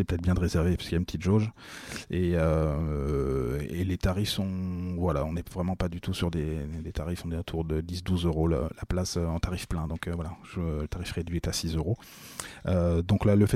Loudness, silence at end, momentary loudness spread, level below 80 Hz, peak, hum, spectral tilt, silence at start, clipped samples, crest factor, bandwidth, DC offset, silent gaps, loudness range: -30 LUFS; 0 s; 9 LU; -38 dBFS; -12 dBFS; none; -6.5 dB/octave; 0 s; under 0.1%; 18 dB; 15.5 kHz; under 0.1%; none; 4 LU